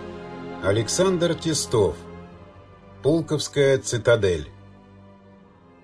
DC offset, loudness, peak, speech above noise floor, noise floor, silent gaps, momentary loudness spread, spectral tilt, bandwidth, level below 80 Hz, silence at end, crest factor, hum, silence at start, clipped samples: under 0.1%; -22 LUFS; -6 dBFS; 29 dB; -51 dBFS; none; 17 LU; -4.5 dB/octave; 11 kHz; -50 dBFS; 1.25 s; 18 dB; none; 0 s; under 0.1%